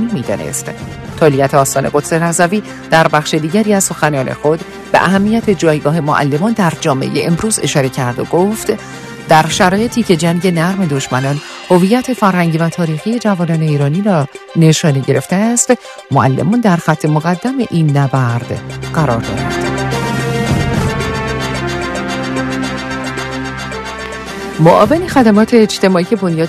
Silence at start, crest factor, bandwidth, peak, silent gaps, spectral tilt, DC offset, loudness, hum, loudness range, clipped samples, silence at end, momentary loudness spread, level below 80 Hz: 0 s; 12 dB; 14 kHz; 0 dBFS; none; -5.5 dB/octave; under 0.1%; -13 LUFS; none; 4 LU; 0.2%; 0 s; 10 LU; -38 dBFS